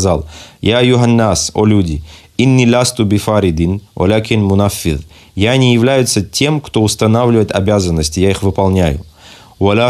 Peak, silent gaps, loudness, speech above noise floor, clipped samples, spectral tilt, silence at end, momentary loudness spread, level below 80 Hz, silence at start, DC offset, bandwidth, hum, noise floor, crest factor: 0 dBFS; none; -12 LUFS; 27 dB; under 0.1%; -5.5 dB/octave; 0 s; 8 LU; -34 dBFS; 0 s; under 0.1%; 14 kHz; none; -39 dBFS; 12 dB